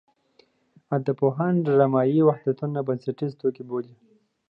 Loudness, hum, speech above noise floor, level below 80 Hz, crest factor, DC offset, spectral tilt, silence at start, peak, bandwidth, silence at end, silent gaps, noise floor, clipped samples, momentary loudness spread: -24 LUFS; none; 39 dB; -74 dBFS; 18 dB; under 0.1%; -11 dB/octave; 0.9 s; -6 dBFS; 5.6 kHz; 0.65 s; none; -62 dBFS; under 0.1%; 12 LU